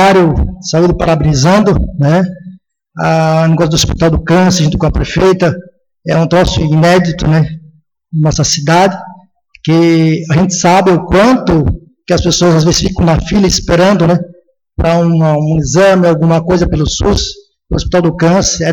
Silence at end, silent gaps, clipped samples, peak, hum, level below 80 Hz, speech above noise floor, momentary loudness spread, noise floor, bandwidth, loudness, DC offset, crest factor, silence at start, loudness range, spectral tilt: 0 s; none; under 0.1%; -2 dBFS; none; -24 dBFS; 34 dB; 8 LU; -43 dBFS; 12 kHz; -10 LUFS; under 0.1%; 8 dB; 0 s; 2 LU; -5.5 dB/octave